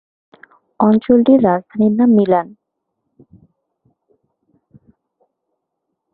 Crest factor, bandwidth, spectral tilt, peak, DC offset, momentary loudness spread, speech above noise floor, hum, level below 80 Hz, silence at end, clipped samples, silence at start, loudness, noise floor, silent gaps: 16 dB; 4.2 kHz; -12.5 dB/octave; -2 dBFS; under 0.1%; 6 LU; 63 dB; none; -58 dBFS; 3.7 s; under 0.1%; 0.8 s; -13 LUFS; -76 dBFS; none